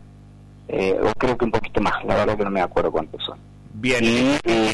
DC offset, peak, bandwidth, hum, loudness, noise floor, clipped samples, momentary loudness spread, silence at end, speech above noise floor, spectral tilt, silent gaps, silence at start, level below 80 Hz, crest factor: under 0.1%; -10 dBFS; 11.5 kHz; 50 Hz at -45 dBFS; -21 LUFS; -44 dBFS; under 0.1%; 11 LU; 0 s; 24 dB; -5 dB/octave; none; 0 s; -40 dBFS; 12 dB